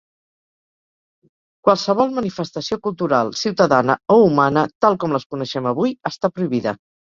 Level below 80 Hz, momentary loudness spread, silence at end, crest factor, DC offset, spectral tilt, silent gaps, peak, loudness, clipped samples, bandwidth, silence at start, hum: -58 dBFS; 10 LU; 0.45 s; 18 dB; under 0.1%; -6 dB/octave; 4.75-4.80 s, 5.26-5.30 s; -2 dBFS; -18 LUFS; under 0.1%; 7.6 kHz; 1.65 s; none